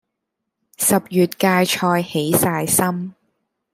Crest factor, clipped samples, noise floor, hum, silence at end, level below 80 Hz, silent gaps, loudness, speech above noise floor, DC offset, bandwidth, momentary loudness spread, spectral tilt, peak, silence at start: 18 dB; under 0.1%; -79 dBFS; none; 0.6 s; -60 dBFS; none; -18 LUFS; 61 dB; under 0.1%; 16 kHz; 5 LU; -4 dB/octave; -2 dBFS; 0.8 s